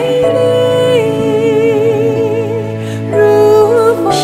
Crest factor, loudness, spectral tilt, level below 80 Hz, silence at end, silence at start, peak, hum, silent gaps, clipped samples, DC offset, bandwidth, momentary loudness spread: 10 dB; -11 LUFS; -6 dB/octave; -48 dBFS; 0 s; 0 s; 0 dBFS; none; none; under 0.1%; under 0.1%; 14.5 kHz; 8 LU